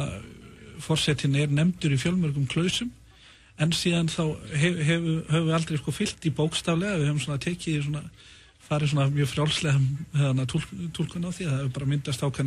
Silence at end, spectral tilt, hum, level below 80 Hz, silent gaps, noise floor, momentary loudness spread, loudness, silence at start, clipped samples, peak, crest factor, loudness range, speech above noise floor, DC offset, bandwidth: 0 s; -5.5 dB/octave; none; -50 dBFS; none; -53 dBFS; 8 LU; -26 LUFS; 0 s; under 0.1%; -10 dBFS; 16 dB; 1 LU; 27 dB; under 0.1%; 13 kHz